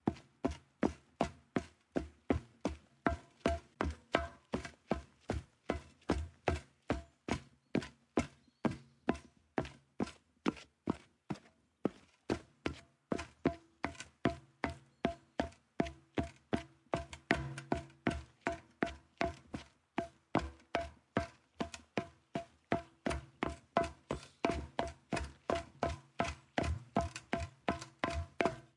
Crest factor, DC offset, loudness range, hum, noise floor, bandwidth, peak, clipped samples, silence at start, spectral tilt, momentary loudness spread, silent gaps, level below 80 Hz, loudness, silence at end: 30 dB; under 0.1%; 3 LU; none; -63 dBFS; 11.5 kHz; -10 dBFS; under 0.1%; 0.05 s; -6 dB/octave; 7 LU; none; -54 dBFS; -41 LUFS; 0.15 s